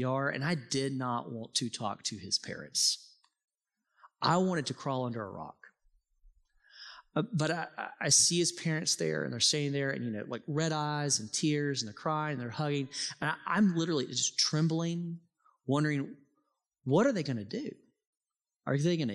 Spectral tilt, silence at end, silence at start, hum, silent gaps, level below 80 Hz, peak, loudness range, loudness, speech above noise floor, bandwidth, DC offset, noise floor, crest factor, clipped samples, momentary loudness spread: -3.5 dB/octave; 0 s; 0 s; none; 3.44-3.48 s, 18.06-18.13 s; -76 dBFS; -12 dBFS; 7 LU; -31 LUFS; 51 dB; 13.5 kHz; under 0.1%; -83 dBFS; 20 dB; under 0.1%; 12 LU